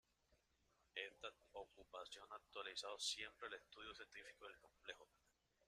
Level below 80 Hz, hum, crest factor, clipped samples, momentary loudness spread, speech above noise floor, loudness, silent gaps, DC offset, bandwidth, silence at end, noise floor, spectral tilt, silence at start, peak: -82 dBFS; none; 24 dB; under 0.1%; 13 LU; 27 dB; -53 LUFS; none; under 0.1%; 13.5 kHz; 0.6 s; -82 dBFS; 0.5 dB/octave; 0.3 s; -32 dBFS